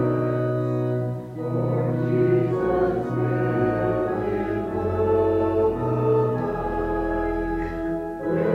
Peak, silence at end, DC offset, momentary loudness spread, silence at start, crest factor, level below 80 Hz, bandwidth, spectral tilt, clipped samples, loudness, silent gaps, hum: -8 dBFS; 0 s; under 0.1%; 7 LU; 0 s; 14 dB; -40 dBFS; 5.8 kHz; -10 dB/octave; under 0.1%; -24 LUFS; none; none